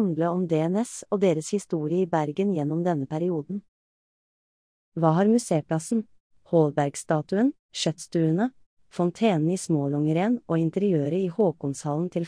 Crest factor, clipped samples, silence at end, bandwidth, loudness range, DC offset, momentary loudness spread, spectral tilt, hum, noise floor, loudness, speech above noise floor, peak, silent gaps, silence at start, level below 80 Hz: 16 dB; under 0.1%; 0 s; 10.5 kHz; 3 LU; under 0.1%; 6 LU; -6.5 dB/octave; none; under -90 dBFS; -25 LUFS; over 66 dB; -8 dBFS; 3.68-4.92 s, 6.20-6.30 s, 7.59-7.69 s, 8.66-8.77 s; 0 s; -70 dBFS